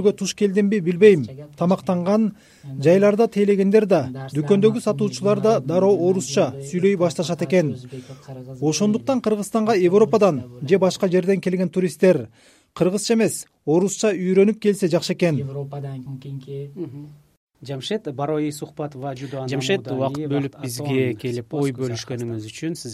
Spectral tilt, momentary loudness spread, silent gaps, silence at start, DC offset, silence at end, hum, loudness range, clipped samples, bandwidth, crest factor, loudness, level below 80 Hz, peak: -6 dB/octave; 15 LU; 17.37-17.47 s; 0 s; under 0.1%; 0 s; none; 8 LU; under 0.1%; 14.5 kHz; 20 dB; -20 LUFS; -62 dBFS; 0 dBFS